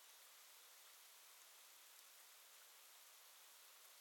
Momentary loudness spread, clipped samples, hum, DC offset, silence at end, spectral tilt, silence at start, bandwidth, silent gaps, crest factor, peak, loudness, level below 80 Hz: 0 LU; under 0.1%; none; under 0.1%; 0 s; 4 dB/octave; 0 s; 18 kHz; none; 24 dB; -42 dBFS; -62 LUFS; under -90 dBFS